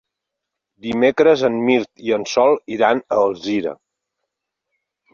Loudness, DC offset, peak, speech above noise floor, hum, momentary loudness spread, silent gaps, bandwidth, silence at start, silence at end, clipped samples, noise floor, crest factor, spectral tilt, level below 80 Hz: -17 LUFS; under 0.1%; -2 dBFS; 64 dB; none; 9 LU; none; 7.2 kHz; 0.85 s; 1.4 s; under 0.1%; -81 dBFS; 18 dB; -5 dB/octave; -60 dBFS